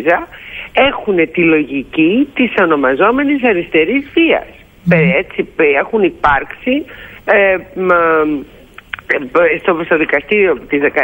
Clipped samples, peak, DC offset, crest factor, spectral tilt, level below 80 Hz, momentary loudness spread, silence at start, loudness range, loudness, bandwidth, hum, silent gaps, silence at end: under 0.1%; 0 dBFS; under 0.1%; 12 dB; -8 dB/octave; -42 dBFS; 7 LU; 0 s; 2 LU; -13 LUFS; 16.5 kHz; none; none; 0 s